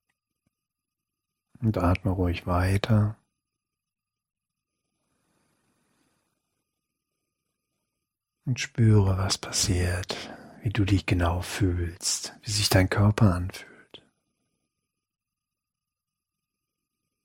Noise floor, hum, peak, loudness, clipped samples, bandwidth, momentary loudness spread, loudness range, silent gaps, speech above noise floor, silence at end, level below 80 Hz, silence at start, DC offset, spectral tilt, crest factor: -89 dBFS; none; -6 dBFS; -25 LUFS; under 0.1%; 16.5 kHz; 11 LU; 7 LU; none; 64 dB; 3.25 s; -46 dBFS; 1.6 s; under 0.1%; -5 dB/octave; 22 dB